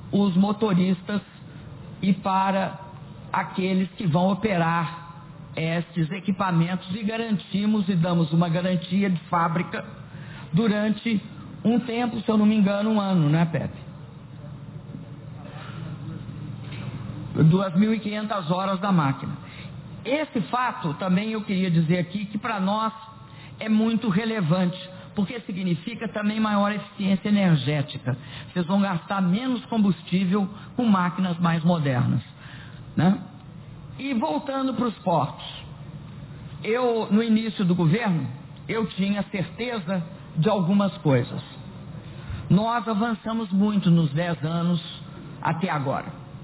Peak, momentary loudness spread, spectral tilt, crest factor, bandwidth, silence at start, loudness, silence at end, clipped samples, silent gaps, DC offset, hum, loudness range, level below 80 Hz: -8 dBFS; 18 LU; -11.5 dB/octave; 16 dB; 4 kHz; 0 s; -24 LUFS; 0 s; under 0.1%; none; under 0.1%; none; 3 LU; -54 dBFS